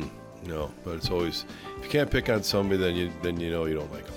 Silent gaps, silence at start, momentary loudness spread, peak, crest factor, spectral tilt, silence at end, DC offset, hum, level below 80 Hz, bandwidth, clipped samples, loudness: none; 0 s; 12 LU; -12 dBFS; 16 dB; -5.5 dB/octave; 0 s; under 0.1%; none; -44 dBFS; 19 kHz; under 0.1%; -28 LUFS